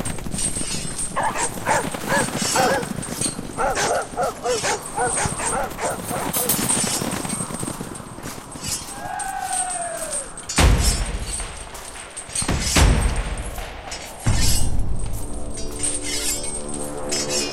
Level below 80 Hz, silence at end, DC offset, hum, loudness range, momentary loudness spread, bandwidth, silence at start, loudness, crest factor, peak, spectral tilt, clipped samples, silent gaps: -28 dBFS; 0 s; under 0.1%; none; 3 LU; 13 LU; 16 kHz; 0 s; -23 LUFS; 20 dB; -2 dBFS; -3 dB/octave; under 0.1%; none